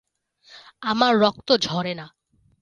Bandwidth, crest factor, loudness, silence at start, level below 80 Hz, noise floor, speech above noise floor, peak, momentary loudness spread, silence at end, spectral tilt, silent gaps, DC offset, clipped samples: 11 kHz; 20 dB; -21 LUFS; 0.5 s; -62 dBFS; -57 dBFS; 36 dB; -4 dBFS; 13 LU; 0.55 s; -4.5 dB/octave; none; under 0.1%; under 0.1%